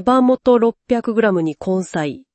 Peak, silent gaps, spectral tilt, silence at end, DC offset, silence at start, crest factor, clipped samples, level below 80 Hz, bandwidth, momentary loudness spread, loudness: -4 dBFS; none; -7 dB/octave; 0.15 s; under 0.1%; 0 s; 14 dB; under 0.1%; -52 dBFS; 8.8 kHz; 8 LU; -17 LUFS